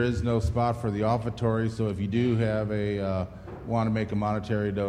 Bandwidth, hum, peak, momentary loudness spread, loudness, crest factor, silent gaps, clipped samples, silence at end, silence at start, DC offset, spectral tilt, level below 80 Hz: 10 kHz; none; -12 dBFS; 5 LU; -28 LUFS; 14 dB; none; under 0.1%; 0 s; 0 s; under 0.1%; -8 dB/octave; -44 dBFS